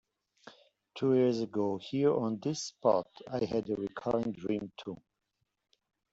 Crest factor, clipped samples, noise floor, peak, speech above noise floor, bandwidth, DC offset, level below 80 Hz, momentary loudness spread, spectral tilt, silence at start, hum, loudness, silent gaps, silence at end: 22 dB; under 0.1%; -83 dBFS; -12 dBFS; 51 dB; 8 kHz; under 0.1%; -70 dBFS; 14 LU; -6.5 dB/octave; 0.45 s; none; -32 LUFS; none; 1.2 s